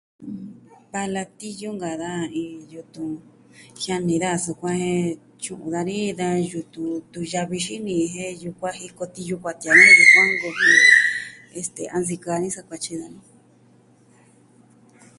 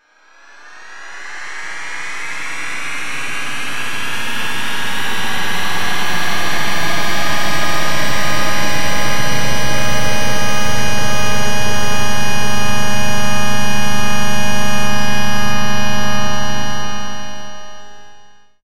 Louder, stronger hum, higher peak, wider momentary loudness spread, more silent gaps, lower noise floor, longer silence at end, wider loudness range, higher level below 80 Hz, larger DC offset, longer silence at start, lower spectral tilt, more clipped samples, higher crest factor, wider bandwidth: about the same, -18 LUFS vs -19 LUFS; neither; about the same, 0 dBFS vs 0 dBFS; first, 22 LU vs 10 LU; neither; first, -55 dBFS vs -47 dBFS; first, 2 s vs 0 s; first, 17 LU vs 5 LU; second, -62 dBFS vs -38 dBFS; second, under 0.1% vs 40%; first, 0.2 s vs 0 s; about the same, -3.5 dB/octave vs -3 dB/octave; neither; first, 22 dB vs 10 dB; second, 11.5 kHz vs 16 kHz